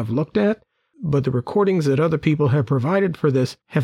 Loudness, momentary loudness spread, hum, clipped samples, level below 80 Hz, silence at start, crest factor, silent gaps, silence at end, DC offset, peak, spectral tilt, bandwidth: -20 LUFS; 5 LU; none; under 0.1%; -52 dBFS; 0 s; 14 dB; none; 0 s; under 0.1%; -6 dBFS; -8 dB/octave; 11.5 kHz